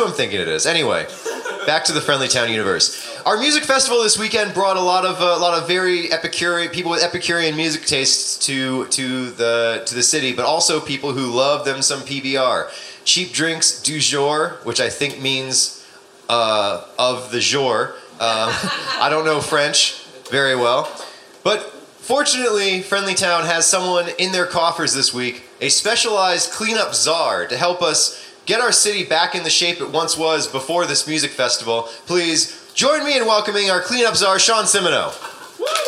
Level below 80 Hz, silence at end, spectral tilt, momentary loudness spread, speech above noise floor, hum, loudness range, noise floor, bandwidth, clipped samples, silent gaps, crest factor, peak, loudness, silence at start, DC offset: -62 dBFS; 0 s; -1.5 dB/octave; 7 LU; 26 dB; none; 2 LU; -44 dBFS; 16 kHz; under 0.1%; none; 18 dB; 0 dBFS; -17 LUFS; 0 s; under 0.1%